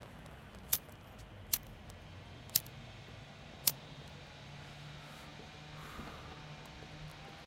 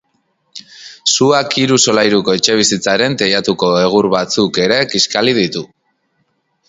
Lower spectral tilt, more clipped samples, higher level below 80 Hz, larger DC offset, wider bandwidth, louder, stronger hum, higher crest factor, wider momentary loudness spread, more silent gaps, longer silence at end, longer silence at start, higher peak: about the same, -2 dB/octave vs -3 dB/octave; neither; second, -60 dBFS vs -52 dBFS; neither; first, 16.5 kHz vs 8 kHz; second, -40 LUFS vs -12 LUFS; neither; first, 36 dB vs 14 dB; first, 18 LU vs 5 LU; neither; second, 0 s vs 1.05 s; second, 0 s vs 0.55 s; second, -8 dBFS vs 0 dBFS